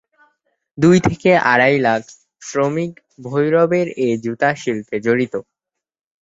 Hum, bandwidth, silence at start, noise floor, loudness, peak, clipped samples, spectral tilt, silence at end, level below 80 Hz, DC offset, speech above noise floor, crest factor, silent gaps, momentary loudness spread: none; 8 kHz; 0.75 s; -83 dBFS; -17 LUFS; -2 dBFS; under 0.1%; -6 dB/octave; 0.8 s; -50 dBFS; under 0.1%; 67 dB; 16 dB; none; 11 LU